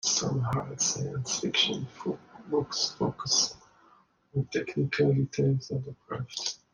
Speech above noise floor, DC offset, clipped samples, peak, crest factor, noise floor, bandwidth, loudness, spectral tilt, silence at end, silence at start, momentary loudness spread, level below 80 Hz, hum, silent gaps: 33 dB; under 0.1%; under 0.1%; -12 dBFS; 18 dB; -62 dBFS; 10.5 kHz; -29 LUFS; -3.5 dB/octave; 0.15 s; 0.05 s; 11 LU; -62 dBFS; none; none